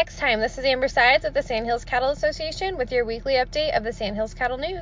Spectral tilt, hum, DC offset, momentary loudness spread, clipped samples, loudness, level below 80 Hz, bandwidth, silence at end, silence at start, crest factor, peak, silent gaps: -4 dB/octave; none; under 0.1%; 9 LU; under 0.1%; -23 LUFS; -40 dBFS; 7.6 kHz; 0 s; 0 s; 18 dB; -6 dBFS; none